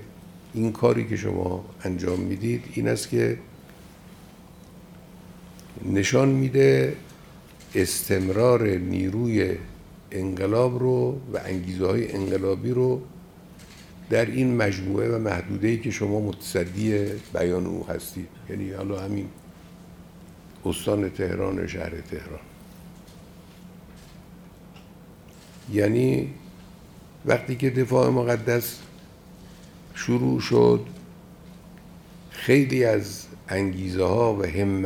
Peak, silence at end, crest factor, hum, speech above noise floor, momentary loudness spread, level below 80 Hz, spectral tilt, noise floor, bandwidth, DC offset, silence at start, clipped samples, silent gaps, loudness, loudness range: -4 dBFS; 0 s; 20 dB; none; 24 dB; 21 LU; -54 dBFS; -6.5 dB/octave; -47 dBFS; 19.5 kHz; under 0.1%; 0 s; under 0.1%; none; -24 LUFS; 8 LU